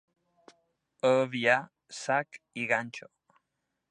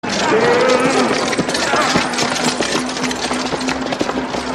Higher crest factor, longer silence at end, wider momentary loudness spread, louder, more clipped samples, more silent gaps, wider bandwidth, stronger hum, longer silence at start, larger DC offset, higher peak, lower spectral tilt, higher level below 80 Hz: first, 22 dB vs 16 dB; first, 0.9 s vs 0 s; first, 16 LU vs 7 LU; second, -29 LUFS vs -16 LUFS; neither; neither; second, 10 kHz vs 14 kHz; neither; first, 1.05 s vs 0.05 s; neither; second, -10 dBFS vs -2 dBFS; first, -4.5 dB/octave vs -3 dB/octave; second, -82 dBFS vs -44 dBFS